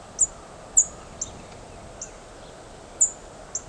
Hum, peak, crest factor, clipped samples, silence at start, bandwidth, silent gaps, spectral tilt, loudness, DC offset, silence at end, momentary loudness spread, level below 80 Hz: none; -6 dBFS; 24 dB; under 0.1%; 0 s; 11 kHz; none; -1 dB/octave; -23 LUFS; under 0.1%; 0 s; 24 LU; -50 dBFS